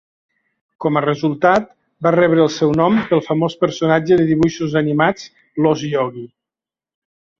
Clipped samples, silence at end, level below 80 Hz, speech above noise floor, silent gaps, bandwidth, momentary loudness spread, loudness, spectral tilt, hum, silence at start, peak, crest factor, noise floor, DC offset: under 0.1%; 1.15 s; -54 dBFS; 73 dB; none; 7.4 kHz; 8 LU; -16 LUFS; -6.5 dB/octave; none; 0.8 s; -2 dBFS; 16 dB; -89 dBFS; under 0.1%